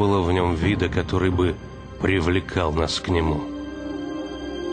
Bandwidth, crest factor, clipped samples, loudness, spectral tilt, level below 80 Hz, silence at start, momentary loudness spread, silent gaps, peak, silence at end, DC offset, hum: 9.8 kHz; 16 dB; under 0.1%; -23 LUFS; -6.5 dB/octave; -36 dBFS; 0 s; 11 LU; none; -6 dBFS; 0 s; under 0.1%; none